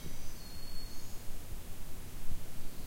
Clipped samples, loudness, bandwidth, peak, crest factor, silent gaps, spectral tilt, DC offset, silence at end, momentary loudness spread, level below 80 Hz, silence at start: under 0.1%; -48 LUFS; 16 kHz; -20 dBFS; 12 dB; none; -4 dB/octave; under 0.1%; 0 s; 2 LU; -42 dBFS; 0 s